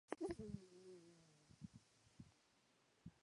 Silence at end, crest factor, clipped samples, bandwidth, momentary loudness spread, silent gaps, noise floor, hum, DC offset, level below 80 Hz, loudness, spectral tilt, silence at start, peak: 0.05 s; 28 dB; under 0.1%; 11 kHz; 18 LU; none; -78 dBFS; none; under 0.1%; -74 dBFS; -55 LUFS; -6.5 dB/octave; 0.1 s; -28 dBFS